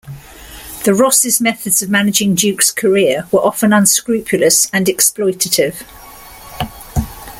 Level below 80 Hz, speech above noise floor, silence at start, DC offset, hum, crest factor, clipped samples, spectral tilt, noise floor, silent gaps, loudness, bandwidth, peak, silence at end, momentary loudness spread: -38 dBFS; 22 dB; 0.05 s; under 0.1%; none; 14 dB; under 0.1%; -3 dB/octave; -35 dBFS; none; -12 LUFS; 17 kHz; 0 dBFS; 0 s; 15 LU